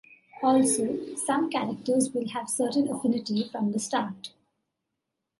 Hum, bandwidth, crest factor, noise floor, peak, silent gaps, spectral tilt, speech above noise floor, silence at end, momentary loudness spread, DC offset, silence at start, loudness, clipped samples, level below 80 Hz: none; 12 kHz; 16 dB; -83 dBFS; -12 dBFS; none; -4 dB/octave; 57 dB; 1.1 s; 8 LU; under 0.1%; 0.35 s; -27 LUFS; under 0.1%; -74 dBFS